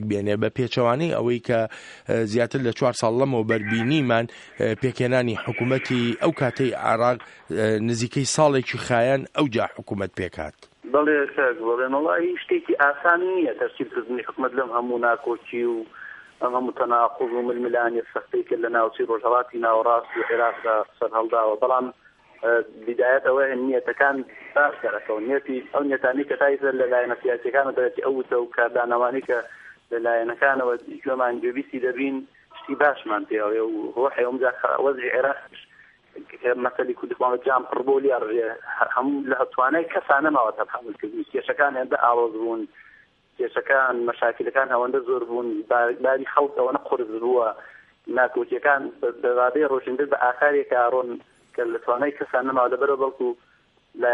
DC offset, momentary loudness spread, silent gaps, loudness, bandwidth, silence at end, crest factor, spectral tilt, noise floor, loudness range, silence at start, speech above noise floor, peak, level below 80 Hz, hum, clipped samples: under 0.1%; 9 LU; none; -23 LUFS; 11.5 kHz; 0 s; 20 dB; -5.5 dB/octave; -56 dBFS; 3 LU; 0 s; 33 dB; -2 dBFS; -64 dBFS; none; under 0.1%